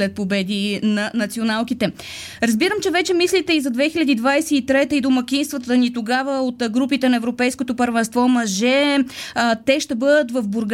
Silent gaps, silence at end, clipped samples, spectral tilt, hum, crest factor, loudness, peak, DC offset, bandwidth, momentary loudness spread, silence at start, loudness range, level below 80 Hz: none; 0 s; under 0.1%; -4 dB/octave; none; 14 dB; -19 LUFS; -4 dBFS; under 0.1%; 16 kHz; 5 LU; 0 s; 2 LU; -56 dBFS